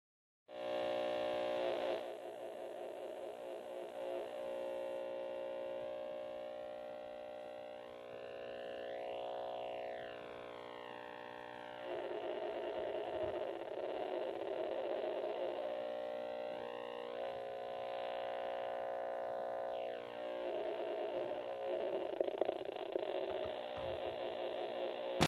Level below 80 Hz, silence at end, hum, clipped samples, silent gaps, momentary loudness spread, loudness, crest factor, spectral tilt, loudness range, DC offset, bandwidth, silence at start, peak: -72 dBFS; 0 s; none; under 0.1%; none; 10 LU; -43 LUFS; 26 dB; -5 dB/octave; 5 LU; under 0.1%; 12 kHz; 0.5 s; -16 dBFS